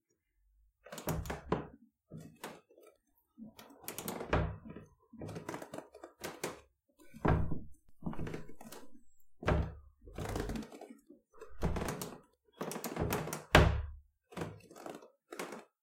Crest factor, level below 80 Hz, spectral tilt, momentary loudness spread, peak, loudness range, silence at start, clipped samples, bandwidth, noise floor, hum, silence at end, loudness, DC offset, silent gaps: 30 dB; -46 dBFS; -5.5 dB/octave; 21 LU; -10 dBFS; 10 LU; 0.85 s; under 0.1%; 16.5 kHz; -77 dBFS; none; 0.2 s; -38 LUFS; under 0.1%; none